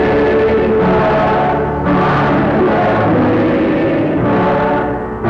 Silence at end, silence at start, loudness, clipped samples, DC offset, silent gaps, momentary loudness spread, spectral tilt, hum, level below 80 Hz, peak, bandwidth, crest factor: 0 s; 0 s; -13 LUFS; under 0.1%; under 0.1%; none; 3 LU; -9 dB/octave; none; -32 dBFS; -6 dBFS; 7 kHz; 6 dB